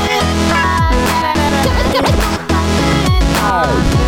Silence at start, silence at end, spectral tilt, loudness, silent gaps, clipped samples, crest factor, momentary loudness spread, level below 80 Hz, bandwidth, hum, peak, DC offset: 0 s; 0 s; -5 dB/octave; -13 LUFS; none; under 0.1%; 10 dB; 1 LU; -20 dBFS; 17.5 kHz; none; -2 dBFS; under 0.1%